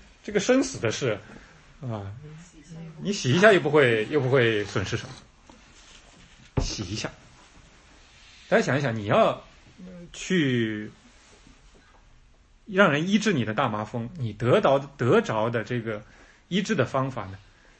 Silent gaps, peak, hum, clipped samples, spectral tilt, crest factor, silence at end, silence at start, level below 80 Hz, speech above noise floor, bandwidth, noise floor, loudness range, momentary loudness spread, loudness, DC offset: none; -4 dBFS; none; under 0.1%; -5.5 dB/octave; 24 dB; 0.4 s; 0.25 s; -50 dBFS; 32 dB; 8.8 kHz; -56 dBFS; 8 LU; 18 LU; -24 LUFS; under 0.1%